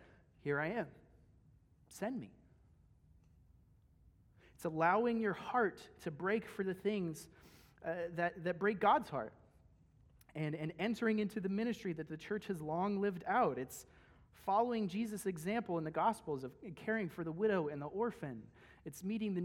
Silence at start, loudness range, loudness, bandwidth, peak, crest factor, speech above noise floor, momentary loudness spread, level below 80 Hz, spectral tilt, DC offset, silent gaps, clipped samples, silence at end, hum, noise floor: 0 s; 7 LU; -38 LUFS; 16.5 kHz; -18 dBFS; 22 dB; 30 dB; 14 LU; -70 dBFS; -6.5 dB/octave; under 0.1%; none; under 0.1%; 0 s; none; -68 dBFS